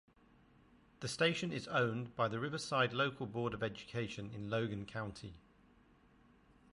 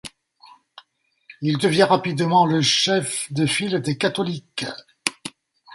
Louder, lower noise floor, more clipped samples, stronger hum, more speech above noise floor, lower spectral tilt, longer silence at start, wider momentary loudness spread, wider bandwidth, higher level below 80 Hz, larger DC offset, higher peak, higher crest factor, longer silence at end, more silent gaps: second, -38 LUFS vs -21 LUFS; first, -67 dBFS vs -60 dBFS; neither; neither; second, 29 dB vs 39 dB; about the same, -5 dB/octave vs -4 dB/octave; first, 1 s vs 0.05 s; about the same, 11 LU vs 13 LU; about the same, 11.5 kHz vs 11.5 kHz; second, -68 dBFS vs -62 dBFS; neither; second, -18 dBFS vs 0 dBFS; about the same, 22 dB vs 22 dB; first, 1.35 s vs 0 s; neither